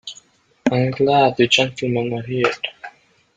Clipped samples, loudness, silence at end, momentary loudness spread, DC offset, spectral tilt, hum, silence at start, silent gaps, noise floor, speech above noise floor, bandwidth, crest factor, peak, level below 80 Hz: under 0.1%; -18 LUFS; 0.5 s; 16 LU; under 0.1%; -5 dB/octave; none; 0.05 s; none; -51 dBFS; 33 dB; 9.4 kHz; 18 dB; -2 dBFS; -58 dBFS